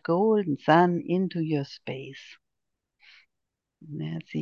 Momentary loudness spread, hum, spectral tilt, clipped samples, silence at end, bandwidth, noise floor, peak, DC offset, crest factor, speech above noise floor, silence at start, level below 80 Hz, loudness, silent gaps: 19 LU; none; -8 dB/octave; under 0.1%; 0 s; 7 kHz; -84 dBFS; -6 dBFS; under 0.1%; 22 dB; 58 dB; 0.1 s; -74 dBFS; -26 LUFS; none